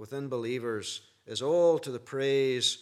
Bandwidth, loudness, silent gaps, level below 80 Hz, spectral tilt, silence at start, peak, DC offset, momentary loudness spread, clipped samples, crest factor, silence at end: 13.5 kHz; -29 LUFS; none; -82 dBFS; -4 dB/octave; 0 s; -14 dBFS; under 0.1%; 13 LU; under 0.1%; 16 dB; 0 s